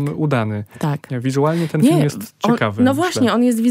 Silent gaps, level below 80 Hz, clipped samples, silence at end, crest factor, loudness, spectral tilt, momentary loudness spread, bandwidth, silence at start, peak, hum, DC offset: none; -60 dBFS; under 0.1%; 0 s; 14 dB; -18 LUFS; -6.5 dB/octave; 8 LU; 16 kHz; 0 s; -2 dBFS; none; under 0.1%